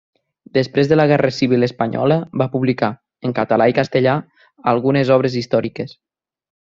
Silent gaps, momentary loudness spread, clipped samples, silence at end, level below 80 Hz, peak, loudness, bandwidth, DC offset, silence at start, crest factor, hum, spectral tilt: none; 9 LU; under 0.1%; 0.85 s; -56 dBFS; -2 dBFS; -17 LUFS; 7.6 kHz; under 0.1%; 0.55 s; 16 dB; none; -7.5 dB/octave